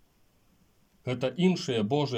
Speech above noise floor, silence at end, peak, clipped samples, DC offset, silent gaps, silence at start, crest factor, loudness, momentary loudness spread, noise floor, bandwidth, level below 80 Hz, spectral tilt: 38 dB; 0 s; -12 dBFS; under 0.1%; under 0.1%; none; 1.05 s; 18 dB; -28 LUFS; 10 LU; -65 dBFS; 9.2 kHz; -70 dBFS; -6.5 dB/octave